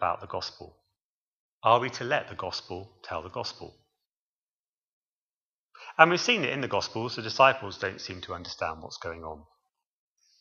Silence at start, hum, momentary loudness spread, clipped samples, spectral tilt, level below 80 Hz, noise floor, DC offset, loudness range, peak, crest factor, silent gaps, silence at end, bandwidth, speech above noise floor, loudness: 0 s; none; 20 LU; under 0.1%; -4 dB/octave; -64 dBFS; under -90 dBFS; under 0.1%; 14 LU; 0 dBFS; 30 dB; 1.02-1.61 s, 4.06-5.69 s; 1 s; 7.4 kHz; over 62 dB; -28 LUFS